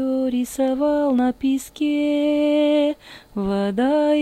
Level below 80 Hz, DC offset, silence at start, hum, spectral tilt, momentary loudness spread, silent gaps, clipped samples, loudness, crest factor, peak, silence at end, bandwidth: -52 dBFS; under 0.1%; 0 s; none; -5.5 dB/octave; 6 LU; none; under 0.1%; -20 LUFS; 10 dB; -10 dBFS; 0 s; 14 kHz